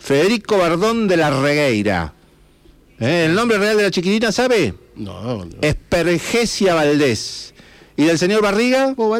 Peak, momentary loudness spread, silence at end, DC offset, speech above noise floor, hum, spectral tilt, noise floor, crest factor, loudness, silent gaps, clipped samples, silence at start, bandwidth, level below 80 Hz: -6 dBFS; 11 LU; 0 s; under 0.1%; 34 dB; none; -5 dB/octave; -50 dBFS; 10 dB; -16 LUFS; none; under 0.1%; 0.05 s; 16.5 kHz; -42 dBFS